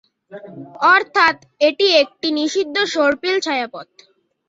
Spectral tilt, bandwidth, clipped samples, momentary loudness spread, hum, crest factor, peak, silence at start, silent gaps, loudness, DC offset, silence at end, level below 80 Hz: -2 dB/octave; 7.8 kHz; under 0.1%; 19 LU; none; 18 dB; -2 dBFS; 0.3 s; none; -16 LUFS; under 0.1%; 0.65 s; -64 dBFS